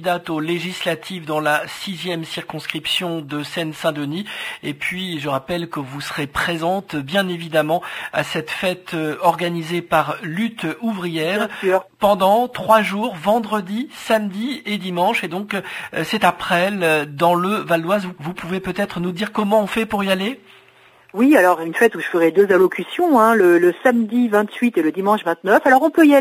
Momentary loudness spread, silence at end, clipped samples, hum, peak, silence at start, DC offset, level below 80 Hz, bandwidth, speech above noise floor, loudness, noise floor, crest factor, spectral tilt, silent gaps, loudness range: 12 LU; 0 s; under 0.1%; none; 0 dBFS; 0 s; under 0.1%; -56 dBFS; 16 kHz; 32 dB; -19 LUFS; -50 dBFS; 18 dB; -5 dB/octave; none; 8 LU